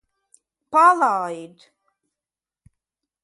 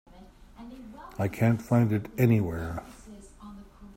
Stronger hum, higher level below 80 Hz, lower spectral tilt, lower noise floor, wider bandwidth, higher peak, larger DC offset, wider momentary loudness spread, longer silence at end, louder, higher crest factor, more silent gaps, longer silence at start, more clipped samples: neither; second, -74 dBFS vs -52 dBFS; second, -4.5 dB/octave vs -8.5 dB/octave; first, under -90 dBFS vs -51 dBFS; second, 11.5 kHz vs 16 kHz; first, -4 dBFS vs -10 dBFS; neither; second, 16 LU vs 24 LU; first, 1.75 s vs 0.05 s; first, -18 LUFS vs -27 LUFS; about the same, 20 dB vs 18 dB; neither; first, 0.7 s vs 0.15 s; neither